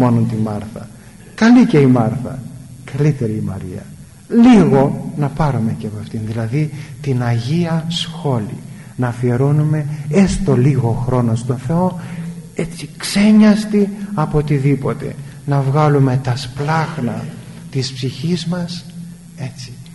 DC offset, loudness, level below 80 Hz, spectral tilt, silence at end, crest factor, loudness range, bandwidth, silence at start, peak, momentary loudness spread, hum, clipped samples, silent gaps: 0.2%; -16 LUFS; -38 dBFS; -7 dB/octave; 0 s; 14 dB; 5 LU; 11.5 kHz; 0 s; -2 dBFS; 18 LU; none; under 0.1%; none